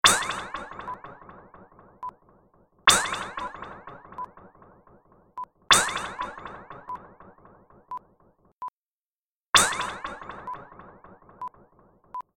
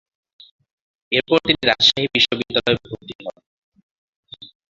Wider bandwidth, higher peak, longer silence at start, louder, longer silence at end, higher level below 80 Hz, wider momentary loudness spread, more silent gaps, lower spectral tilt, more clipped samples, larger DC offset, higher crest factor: first, 16 kHz vs 7.8 kHz; second, -4 dBFS vs 0 dBFS; second, 0.05 s vs 1.1 s; second, -24 LUFS vs -17 LUFS; about the same, 0.15 s vs 0.25 s; about the same, -56 dBFS vs -54 dBFS; about the same, 22 LU vs 23 LU; first, 8.52-8.59 s, 8.70-9.53 s vs 3.15-3.19 s, 3.46-3.72 s, 3.83-4.23 s; second, 0 dB/octave vs -3.5 dB/octave; neither; neither; about the same, 26 dB vs 22 dB